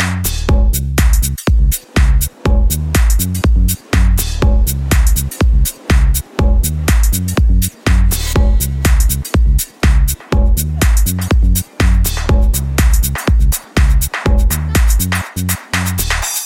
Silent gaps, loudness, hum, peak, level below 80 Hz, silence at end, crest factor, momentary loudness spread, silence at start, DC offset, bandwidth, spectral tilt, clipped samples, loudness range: none; -14 LUFS; none; 0 dBFS; -12 dBFS; 0 s; 12 dB; 2 LU; 0 s; under 0.1%; 17 kHz; -4.5 dB/octave; under 0.1%; 0 LU